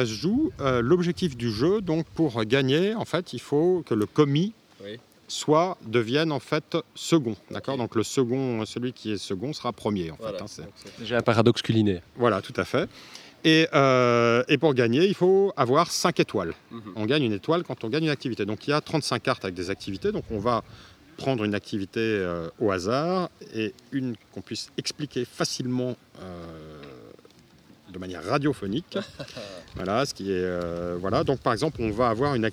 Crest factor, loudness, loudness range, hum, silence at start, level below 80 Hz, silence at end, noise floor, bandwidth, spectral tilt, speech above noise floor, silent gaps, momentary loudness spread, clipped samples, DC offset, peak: 22 dB; -25 LUFS; 10 LU; none; 0 s; -56 dBFS; 0 s; -54 dBFS; 15.5 kHz; -5.5 dB/octave; 29 dB; none; 16 LU; under 0.1%; under 0.1%; -4 dBFS